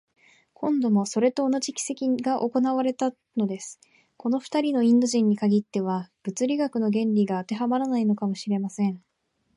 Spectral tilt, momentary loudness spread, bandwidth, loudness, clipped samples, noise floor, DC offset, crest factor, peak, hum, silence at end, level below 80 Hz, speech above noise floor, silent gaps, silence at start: -6 dB/octave; 8 LU; 11.5 kHz; -25 LUFS; under 0.1%; -73 dBFS; under 0.1%; 14 dB; -10 dBFS; none; 0.6 s; -76 dBFS; 49 dB; none; 0.6 s